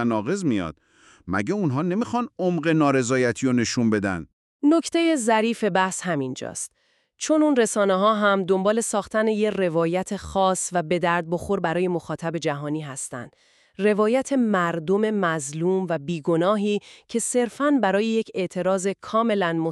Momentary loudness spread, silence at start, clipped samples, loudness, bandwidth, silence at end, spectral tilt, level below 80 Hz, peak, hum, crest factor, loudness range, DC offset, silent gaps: 9 LU; 0 s; under 0.1%; -23 LUFS; 13 kHz; 0 s; -5 dB/octave; -58 dBFS; -6 dBFS; none; 16 dB; 3 LU; under 0.1%; 4.33-4.60 s